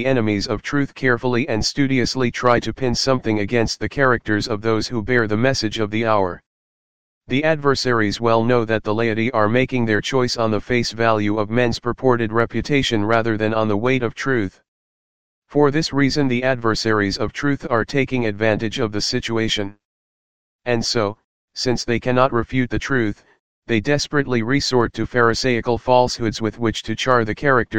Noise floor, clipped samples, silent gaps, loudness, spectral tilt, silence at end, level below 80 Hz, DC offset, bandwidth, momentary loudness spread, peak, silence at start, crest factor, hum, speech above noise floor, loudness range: under -90 dBFS; under 0.1%; 6.46-7.21 s, 14.68-15.42 s, 19.85-20.59 s, 21.24-21.48 s, 23.40-23.62 s; -19 LUFS; -5 dB/octave; 0 s; -42 dBFS; 2%; 15.5 kHz; 5 LU; 0 dBFS; 0 s; 18 dB; none; over 71 dB; 3 LU